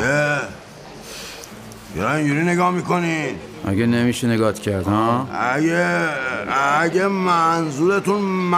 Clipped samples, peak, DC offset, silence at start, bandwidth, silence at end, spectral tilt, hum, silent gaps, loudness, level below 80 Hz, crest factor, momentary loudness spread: under 0.1%; -6 dBFS; under 0.1%; 0 s; 16 kHz; 0 s; -5.5 dB/octave; none; none; -19 LUFS; -52 dBFS; 14 dB; 16 LU